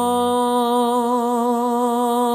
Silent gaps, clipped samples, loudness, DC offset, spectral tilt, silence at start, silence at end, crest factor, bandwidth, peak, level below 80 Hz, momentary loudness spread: none; under 0.1%; -19 LUFS; under 0.1%; -4 dB/octave; 0 s; 0 s; 10 dB; 15.5 kHz; -8 dBFS; -68 dBFS; 1 LU